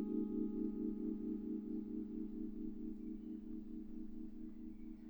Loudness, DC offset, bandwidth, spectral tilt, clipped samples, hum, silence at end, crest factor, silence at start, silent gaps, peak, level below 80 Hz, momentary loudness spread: -46 LUFS; under 0.1%; over 20 kHz; -11 dB/octave; under 0.1%; none; 0 s; 16 dB; 0 s; none; -30 dBFS; -58 dBFS; 10 LU